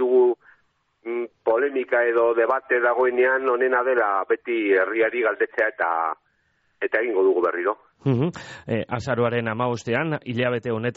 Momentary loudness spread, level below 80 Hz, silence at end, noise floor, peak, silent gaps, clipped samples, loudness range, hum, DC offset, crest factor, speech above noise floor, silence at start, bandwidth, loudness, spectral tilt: 9 LU; -62 dBFS; 0.05 s; -67 dBFS; -8 dBFS; none; under 0.1%; 4 LU; none; under 0.1%; 14 dB; 45 dB; 0 s; 7.8 kHz; -22 LUFS; -5 dB/octave